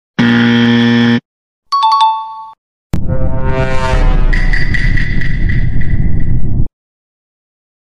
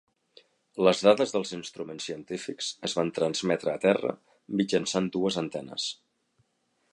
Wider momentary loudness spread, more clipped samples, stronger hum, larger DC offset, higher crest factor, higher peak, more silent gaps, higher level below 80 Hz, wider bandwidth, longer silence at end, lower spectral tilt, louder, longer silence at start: second, 11 LU vs 14 LU; neither; neither; neither; second, 10 dB vs 22 dB; first, 0 dBFS vs -6 dBFS; first, 1.25-1.62 s, 2.58-2.90 s vs none; first, -16 dBFS vs -70 dBFS; second, 7.4 kHz vs 11.5 kHz; first, 1.25 s vs 1 s; first, -7 dB/octave vs -4.5 dB/octave; first, -13 LUFS vs -28 LUFS; second, 0.2 s vs 0.75 s